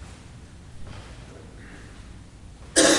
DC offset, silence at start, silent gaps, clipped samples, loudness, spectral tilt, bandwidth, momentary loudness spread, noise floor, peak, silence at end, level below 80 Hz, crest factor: under 0.1%; 0 s; none; under 0.1%; -21 LUFS; -2 dB/octave; 11.5 kHz; 18 LU; -44 dBFS; -4 dBFS; 0 s; -46 dBFS; 24 dB